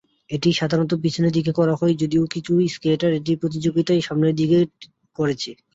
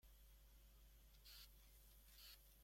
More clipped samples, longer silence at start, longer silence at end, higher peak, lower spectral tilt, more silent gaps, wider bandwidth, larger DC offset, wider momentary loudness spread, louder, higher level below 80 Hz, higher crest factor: neither; first, 0.3 s vs 0 s; first, 0.2 s vs 0 s; first, -6 dBFS vs -50 dBFS; first, -6.5 dB/octave vs -2 dB/octave; neither; second, 7.8 kHz vs 16.5 kHz; neither; about the same, 5 LU vs 6 LU; first, -21 LUFS vs -65 LUFS; first, -56 dBFS vs -68 dBFS; about the same, 14 dB vs 16 dB